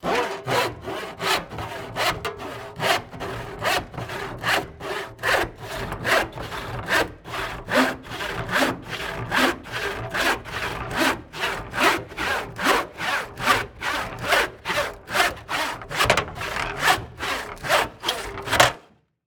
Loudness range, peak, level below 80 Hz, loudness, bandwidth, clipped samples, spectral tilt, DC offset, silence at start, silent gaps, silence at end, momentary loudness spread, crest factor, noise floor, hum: 3 LU; 0 dBFS; -46 dBFS; -24 LUFS; over 20 kHz; under 0.1%; -3 dB/octave; under 0.1%; 0 s; none; 0.45 s; 10 LU; 24 dB; -53 dBFS; none